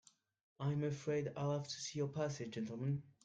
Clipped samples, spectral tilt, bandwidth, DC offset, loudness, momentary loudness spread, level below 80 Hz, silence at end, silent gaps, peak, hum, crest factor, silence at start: under 0.1%; -6 dB/octave; 8.8 kHz; under 0.1%; -41 LUFS; 5 LU; -76 dBFS; 0.15 s; none; -26 dBFS; none; 14 dB; 0.6 s